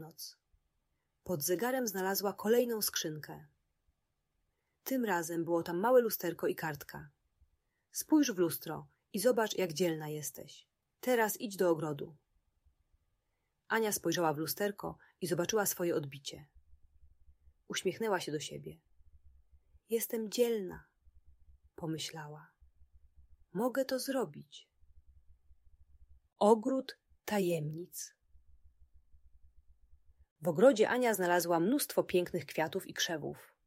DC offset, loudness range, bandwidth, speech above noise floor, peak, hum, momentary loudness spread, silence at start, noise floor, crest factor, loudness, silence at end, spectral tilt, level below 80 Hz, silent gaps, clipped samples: under 0.1%; 8 LU; 16 kHz; 49 dB; -12 dBFS; none; 18 LU; 0 s; -83 dBFS; 24 dB; -34 LUFS; 0.2 s; -4 dB/octave; -70 dBFS; 30.31-30.36 s; under 0.1%